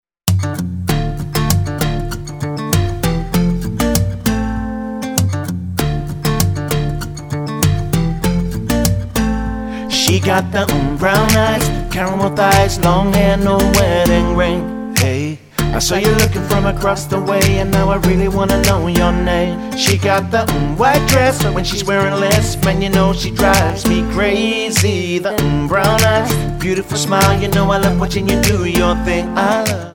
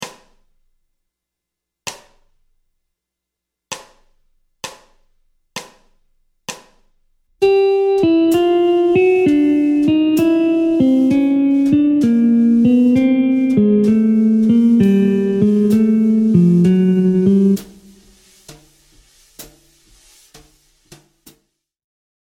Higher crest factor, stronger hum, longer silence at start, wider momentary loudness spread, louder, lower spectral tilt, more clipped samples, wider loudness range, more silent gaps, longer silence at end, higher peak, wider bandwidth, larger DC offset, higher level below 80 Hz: about the same, 14 dB vs 14 dB; neither; first, 0.25 s vs 0 s; second, 7 LU vs 19 LU; about the same, -15 LUFS vs -13 LUFS; second, -5 dB/octave vs -7.5 dB/octave; neither; second, 5 LU vs 23 LU; neither; second, 0 s vs 2.8 s; about the same, 0 dBFS vs -2 dBFS; first, over 20 kHz vs 16 kHz; neither; first, -26 dBFS vs -52 dBFS